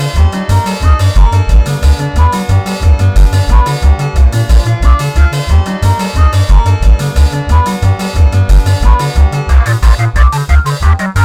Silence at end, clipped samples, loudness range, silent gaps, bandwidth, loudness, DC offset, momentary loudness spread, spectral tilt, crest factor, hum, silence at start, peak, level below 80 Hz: 0 s; 2%; 0 LU; none; 14.5 kHz; -10 LUFS; under 0.1%; 3 LU; -6 dB/octave; 8 dB; none; 0 s; 0 dBFS; -10 dBFS